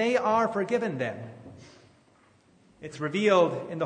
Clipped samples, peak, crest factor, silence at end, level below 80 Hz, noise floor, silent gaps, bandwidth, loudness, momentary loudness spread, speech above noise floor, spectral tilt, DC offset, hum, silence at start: under 0.1%; -10 dBFS; 18 dB; 0 s; -72 dBFS; -61 dBFS; none; 9.6 kHz; -26 LUFS; 22 LU; 35 dB; -5.5 dB/octave; under 0.1%; none; 0 s